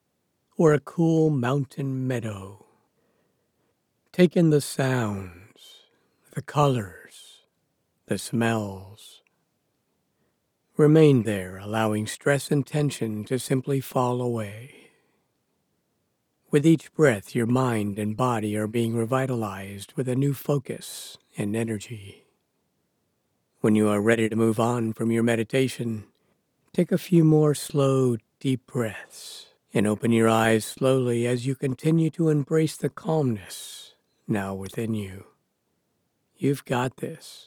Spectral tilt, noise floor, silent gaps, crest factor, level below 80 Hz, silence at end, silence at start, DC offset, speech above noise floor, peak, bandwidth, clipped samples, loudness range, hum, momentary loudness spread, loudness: -6.5 dB/octave; -74 dBFS; none; 20 dB; -66 dBFS; 0.1 s; 0.6 s; under 0.1%; 50 dB; -6 dBFS; 19 kHz; under 0.1%; 7 LU; none; 16 LU; -24 LUFS